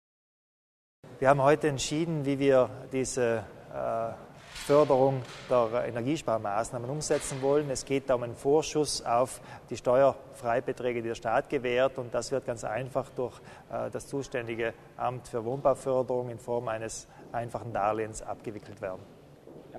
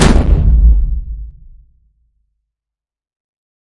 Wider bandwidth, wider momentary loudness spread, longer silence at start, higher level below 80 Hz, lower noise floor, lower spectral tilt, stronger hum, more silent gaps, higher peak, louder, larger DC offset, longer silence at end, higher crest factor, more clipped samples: first, 13.5 kHz vs 11 kHz; second, 14 LU vs 20 LU; first, 1.05 s vs 0 s; second, -58 dBFS vs -14 dBFS; second, -51 dBFS vs -87 dBFS; about the same, -5 dB/octave vs -6 dB/octave; neither; neither; second, -8 dBFS vs 0 dBFS; second, -30 LUFS vs -13 LUFS; neither; second, 0 s vs 2.5 s; first, 22 dB vs 14 dB; neither